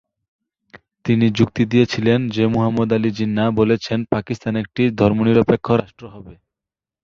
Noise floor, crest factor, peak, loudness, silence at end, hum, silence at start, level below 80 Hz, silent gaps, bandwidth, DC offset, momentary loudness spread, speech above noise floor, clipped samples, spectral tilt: -88 dBFS; 18 dB; -2 dBFS; -18 LUFS; 0.7 s; none; 1.05 s; -48 dBFS; none; 7.2 kHz; under 0.1%; 7 LU; 71 dB; under 0.1%; -7.5 dB/octave